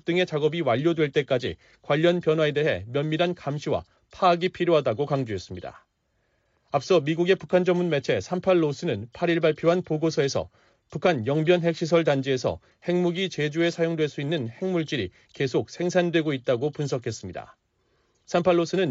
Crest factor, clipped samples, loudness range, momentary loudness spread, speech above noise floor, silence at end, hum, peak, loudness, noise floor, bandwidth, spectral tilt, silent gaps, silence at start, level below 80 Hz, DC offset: 16 dB; under 0.1%; 3 LU; 9 LU; 47 dB; 0 s; none; -8 dBFS; -25 LUFS; -71 dBFS; 7.8 kHz; -5 dB/octave; none; 0.05 s; -60 dBFS; under 0.1%